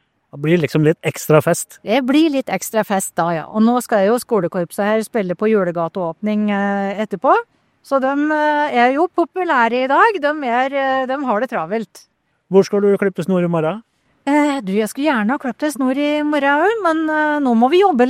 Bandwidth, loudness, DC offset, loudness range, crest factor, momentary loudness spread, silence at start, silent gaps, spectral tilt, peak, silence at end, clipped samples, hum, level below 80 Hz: 16 kHz; -17 LUFS; under 0.1%; 3 LU; 16 dB; 7 LU; 0.35 s; none; -5.5 dB/octave; 0 dBFS; 0 s; under 0.1%; none; -64 dBFS